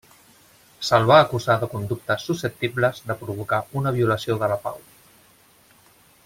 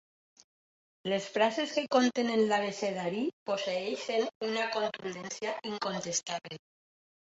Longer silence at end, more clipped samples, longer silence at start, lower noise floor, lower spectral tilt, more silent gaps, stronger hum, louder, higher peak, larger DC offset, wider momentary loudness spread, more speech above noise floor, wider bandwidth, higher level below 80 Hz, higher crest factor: first, 1.45 s vs 0.7 s; neither; second, 0.8 s vs 1.05 s; second, -55 dBFS vs under -90 dBFS; first, -5.5 dB/octave vs -3.5 dB/octave; second, none vs 3.33-3.46 s, 4.35-4.41 s; neither; first, -22 LUFS vs -32 LUFS; first, -2 dBFS vs -14 dBFS; neither; first, 14 LU vs 11 LU; second, 34 dB vs over 58 dB; first, 16.5 kHz vs 8.2 kHz; first, -56 dBFS vs -78 dBFS; about the same, 22 dB vs 20 dB